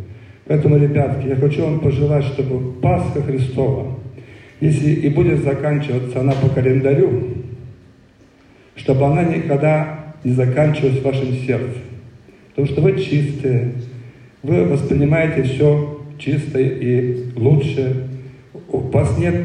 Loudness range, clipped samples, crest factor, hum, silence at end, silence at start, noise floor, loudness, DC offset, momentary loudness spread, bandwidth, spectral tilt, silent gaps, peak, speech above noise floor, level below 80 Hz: 3 LU; under 0.1%; 14 dB; none; 0 s; 0 s; -48 dBFS; -17 LUFS; under 0.1%; 12 LU; 9.6 kHz; -9 dB/octave; none; -4 dBFS; 33 dB; -42 dBFS